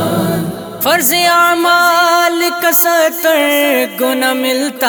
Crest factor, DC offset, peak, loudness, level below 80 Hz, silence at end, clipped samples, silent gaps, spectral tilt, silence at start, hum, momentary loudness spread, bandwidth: 12 dB; under 0.1%; 0 dBFS; -11 LUFS; -56 dBFS; 0 s; under 0.1%; none; -3 dB/octave; 0 s; none; 6 LU; over 20 kHz